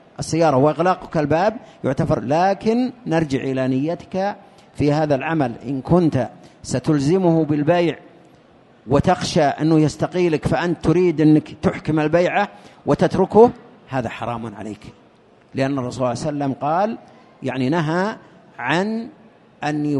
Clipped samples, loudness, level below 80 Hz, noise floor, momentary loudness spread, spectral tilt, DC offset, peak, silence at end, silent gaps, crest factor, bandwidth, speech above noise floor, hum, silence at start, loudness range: under 0.1%; -19 LUFS; -48 dBFS; -51 dBFS; 12 LU; -7 dB/octave; under 0.1%; 0 dBFS; 0 s; none; 18 dB; 11.5 kHz; 33 dB; none; 0.2 s; 5 LU